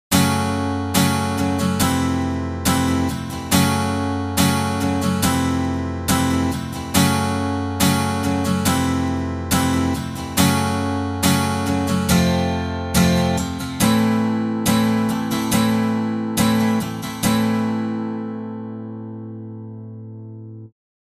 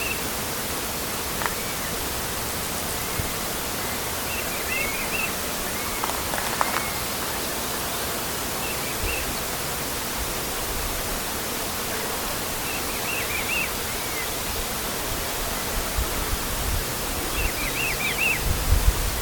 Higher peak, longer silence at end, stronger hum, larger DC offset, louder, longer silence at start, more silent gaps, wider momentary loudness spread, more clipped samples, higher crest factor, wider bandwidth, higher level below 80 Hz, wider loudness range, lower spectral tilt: about the same, -4 dBFS vs -2 dBFS; first, 0.4 s vs 0 s; neither; neither; first, -20 LUFS vs -25 LUFS; about the same, 0.1 s vs 0 s; neither; first, 13 LU vs 3 LU; neither; second, 16 dB vs 24 dB; second, 15.5 kHz vs 19.5 kHz; second, -40 dBFS vs -34 dBFS; about the same, 3 LU vs 2 LU; first, -5 dB/octave vs -2.5 dB/octave